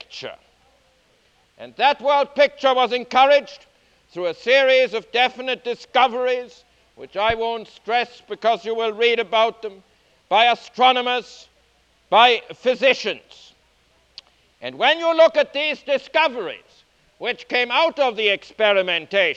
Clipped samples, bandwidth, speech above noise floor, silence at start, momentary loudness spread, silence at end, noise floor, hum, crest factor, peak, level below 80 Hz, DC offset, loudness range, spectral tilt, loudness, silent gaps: under 0.1%; 8 kHz; 41 dB; 0.1 s; 15 LU; 0 s; -60 dBFS; none; 20 dB; 0 dBFS; -60 dBFS; under 0.1%; 4 LU; -3 dB/octave; -19 LUFS; none